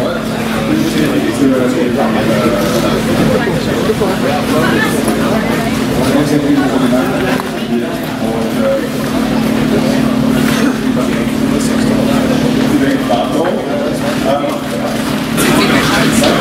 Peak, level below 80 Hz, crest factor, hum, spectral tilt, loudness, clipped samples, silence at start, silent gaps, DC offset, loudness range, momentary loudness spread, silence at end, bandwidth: 0 dBFS; -34 dBFS; 12 dB; none; -5 dB/octave; -13 LUFS; under 0.1%; 0 s; none; under 0.1%; 1 LU; 5 LU; 0 s; 16.5 kHz